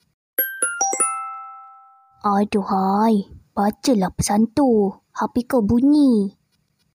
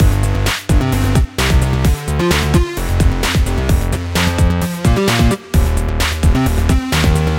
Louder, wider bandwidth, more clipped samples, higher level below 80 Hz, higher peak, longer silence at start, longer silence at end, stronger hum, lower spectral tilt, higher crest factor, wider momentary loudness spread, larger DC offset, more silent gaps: second, -20 LUFS vs -15 LUFS; about the same, 16 kHz vs 17 kHz; neither; second, -48 dBFS vs -18 dBFS; second, -8 dBFS vs 0 dBFS; first, 0.4 s vs 0 s; first, 0.65 s vs 0 s; neither; about the same, -5 dB/octave vs -5.5 dB/octave; about the same, 12 dB vs 14 dB; first, 11 LU vs 3 LU; neither; neither